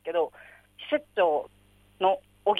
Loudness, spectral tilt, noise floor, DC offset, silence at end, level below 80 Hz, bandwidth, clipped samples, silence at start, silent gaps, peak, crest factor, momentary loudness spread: -28 LUFS; -5 dB/octave; -60 dBFS; under 0.1%; 0 s; -68 dBFS; 11.5 kHz; under 0.1%; 0.05 s; none; -12 dBFS; 18 dB; 11 LU